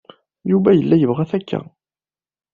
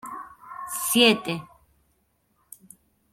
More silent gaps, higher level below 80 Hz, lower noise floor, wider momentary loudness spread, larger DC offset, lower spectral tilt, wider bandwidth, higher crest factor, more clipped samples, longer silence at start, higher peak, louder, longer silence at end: neither; first, -56 dBFS vs -68 dBFS; first, under -90 dBFS vs -69 dBFS; second, 13 LU vs 22 LU; neither; first, -8.5 dB/octave vs -2.5 dB/octave; second, 5 kHz vs 16.5 kHz; second, 18 dB vs 24 dB; neither; first, 0.45 s vs 0.05 s; about the same, -2 dBFS vs -4 dBFS; first, -17 LUFS vs -22 LUFS; second, 0.9 s vs 1.7 s